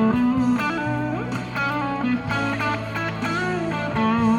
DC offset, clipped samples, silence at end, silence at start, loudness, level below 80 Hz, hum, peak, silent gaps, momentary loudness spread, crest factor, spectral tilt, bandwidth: under 0.1%; under 0.1%; 0 s; 0 s; -23 LUFS; -48 dBFS; none; -8 dBFS; none; 6 LU; 14 dB; -6.5 dB/octave; 12 kHz